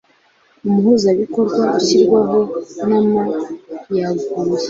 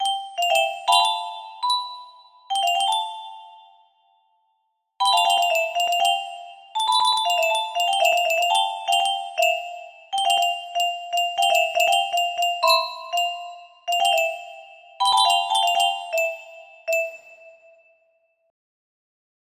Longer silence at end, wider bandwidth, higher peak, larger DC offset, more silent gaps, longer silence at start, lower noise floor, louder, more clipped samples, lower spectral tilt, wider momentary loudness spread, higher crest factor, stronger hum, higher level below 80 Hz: second, 0 s vs 2 s; second, 7.8 kHz vs 15.5 kHz; about the same, -2 dBFS vs -4 dBFS; neither; neither; first, 0.65 s vs 0 s; second, -55 dBFS vs -72 dBFS; first, -16 LUFS vs -21 LUFS; neither; first, -6 dB/octave vs 3 dB/octave; second, 10 LU vs 15 LU; about the same, 14 dB vs 18 dB; neither; first, -58 dBFS vs -76 dBFS